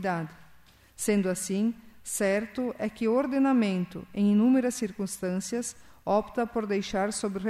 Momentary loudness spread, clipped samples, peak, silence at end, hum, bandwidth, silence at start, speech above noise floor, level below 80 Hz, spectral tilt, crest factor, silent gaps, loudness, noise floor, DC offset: 10 LU; under 0.1%; -14 dBFS; 0 s; none; 14.5 kHz; 0 s; 29 dB; -60 dBFS; -5.5 dB/octave; 14 dB; none; -28 LUFS; -56 dBFS; under 0.1%